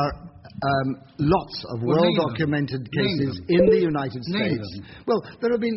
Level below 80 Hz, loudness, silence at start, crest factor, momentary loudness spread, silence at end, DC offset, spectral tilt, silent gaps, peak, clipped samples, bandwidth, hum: -48 dBFS; -23 LUFS; 0 s; 16 dB; 11 LU; 0 s; under 0.1%; -5.5 dB/octave; none; -6 dBFS; under 0.1%; 6 kHz; none